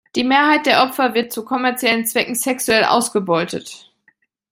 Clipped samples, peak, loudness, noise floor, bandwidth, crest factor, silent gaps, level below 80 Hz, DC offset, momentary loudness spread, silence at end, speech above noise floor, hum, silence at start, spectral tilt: under 0.1%; -2 dBFS; -17 LUFS; -60 dBFS; 16.5 kHz; 16 dB; none; -60 dBFS; under 0.1%; 9 LU; 0.75 s; 43 dB; none; 0.15 s; -2.5 dB/octave